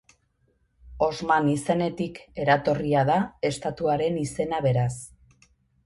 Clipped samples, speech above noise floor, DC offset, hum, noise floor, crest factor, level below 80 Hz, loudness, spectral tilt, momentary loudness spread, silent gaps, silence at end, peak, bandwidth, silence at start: under 0.1%; 44 dB; under 0.1%; none; -68 dBFS; 18 dB; -52 dBFS; -25 LUFS; -6 dB/octave; 8 LU; none; 0.75 s; -8 dBFS; 11.5 kHz; 0.85 s